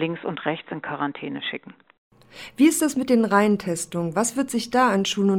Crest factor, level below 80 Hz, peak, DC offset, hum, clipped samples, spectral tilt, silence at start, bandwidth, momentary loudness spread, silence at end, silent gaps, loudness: 18 dB; -64 dBFS; -4 dBFS; under 0.1%; none; under 0.1%; -4.5 dB/octave; 0 s; 17 kHz; 12 LU; 0 s; 1.98-2.11 s; -23 LUFS